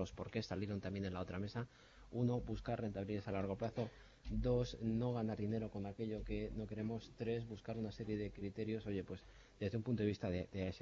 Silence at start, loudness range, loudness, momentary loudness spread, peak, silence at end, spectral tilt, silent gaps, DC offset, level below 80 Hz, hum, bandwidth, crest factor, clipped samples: 0 s; 3 LU; -43 LUFS; 7 LU; -26 dBFS; 0 s; -7 dB/octave; none; under 0.1%; -56 dBFS; none; 7.4 kHz; 16 dB; under 0.1%